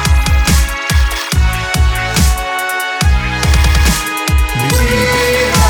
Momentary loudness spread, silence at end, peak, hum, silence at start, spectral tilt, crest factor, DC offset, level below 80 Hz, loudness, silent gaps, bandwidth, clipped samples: 3 LU; 0 s; 0 dBFS; none; 0 s; -4 dB/octave; 12 dB; under 0.1%; -14 dBFS; -13 LUFS; none; 19.5 kHz; under 0.1%